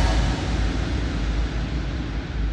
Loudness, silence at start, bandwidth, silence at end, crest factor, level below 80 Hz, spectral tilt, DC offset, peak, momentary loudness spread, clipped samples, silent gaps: -26 LUFS; 0 s; 9 kHz; 0 s; 14 dB; -24 dBFS; -6 dB/octave; under 0.1%; -8 dBFS; 5 LU; under 0.1%; none